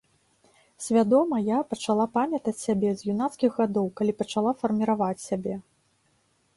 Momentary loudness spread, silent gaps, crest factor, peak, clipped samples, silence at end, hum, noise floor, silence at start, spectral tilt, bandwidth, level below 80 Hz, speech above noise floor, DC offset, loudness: 9 LU; none; 16 dB; -10 dBFS; under 0.1%; 0.95 s; none; -68 dBFS; 0.8 s; -6 dB/octave; 11.5 kHz; -66 dBFS; 43 dB; under 0.1%; -26 LUFS